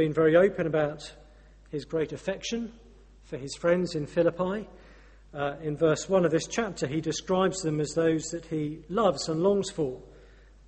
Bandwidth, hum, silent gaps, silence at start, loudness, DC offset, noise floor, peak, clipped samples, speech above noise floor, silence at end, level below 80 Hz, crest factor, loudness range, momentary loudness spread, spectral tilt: 8.8 kHz; none; none; 0 s; -28 LUFS; under 0.1%; -53 dBFS; -8 dBFS; under 0.1%; 26 dB; 0.5 s; -54 dBFS; 20 dB; 4 LU; 14 LU; -5.5 dB/octave